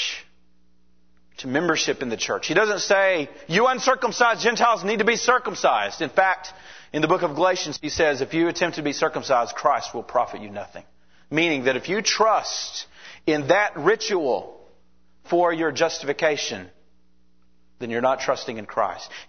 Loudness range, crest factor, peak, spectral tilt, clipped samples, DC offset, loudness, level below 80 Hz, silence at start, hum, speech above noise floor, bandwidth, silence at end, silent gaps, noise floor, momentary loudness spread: 5 LU; 20 dB; -2 dBFS; -3 dB/octave; under 0.1%; 0.3%; -22 LUFS; -60 dBFS; 0 s; none; 42 dB; 6.6 kHz; 0.05 s; none; -64 dBFS; 10 LU